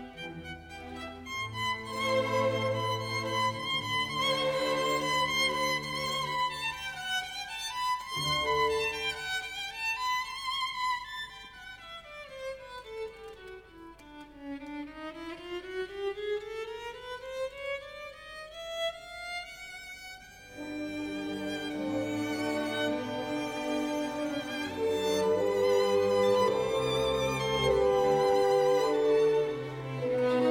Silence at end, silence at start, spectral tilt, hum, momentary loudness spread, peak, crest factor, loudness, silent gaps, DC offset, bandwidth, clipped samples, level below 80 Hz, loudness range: 0 s; 0 s; -4 dB/octave; none; 17 LU; -16 dBFS; 16 dB; -31 LUFS; none; under 0.1%; over 20 kHz; under 0.1%; -58 dBFS; 12 LU